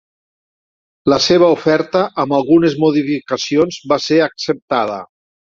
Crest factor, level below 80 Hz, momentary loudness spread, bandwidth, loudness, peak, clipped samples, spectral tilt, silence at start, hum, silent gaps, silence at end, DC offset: 14 dB; -54 dBFS; 8 LU; 7.6 kHz; -15 LUFS; 0 dBFS; under 0.1%; -5 dB/octave; 1.05 s; none; 4.62-4.68 s; 0.4 s; under 0.1%